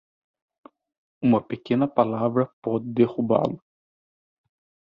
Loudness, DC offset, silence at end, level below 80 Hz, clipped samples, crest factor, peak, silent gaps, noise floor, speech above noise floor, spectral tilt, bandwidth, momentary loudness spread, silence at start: -24 LUFS; under 0.1%; 1.3 s; -64 dBFS; under 0.1%; 22 dB; -4 dBFS; 2.53-2.62 s; under -90 dBFS; over 67 dB; -10 dB/octave; 5.4 kHz; 6 LU; 1.2 s